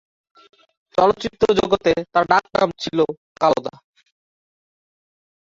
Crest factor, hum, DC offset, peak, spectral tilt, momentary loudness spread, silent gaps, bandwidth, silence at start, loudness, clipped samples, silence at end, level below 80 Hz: 22 dB; none; under 0.1%; 0 dBFS; -5.5 dB/octave; 6 LU; 3.17-3.35 s; 7.8 kHz; 0.95 s; -19 LUFS; under 0.1%; 1.7 s; -52 dBFS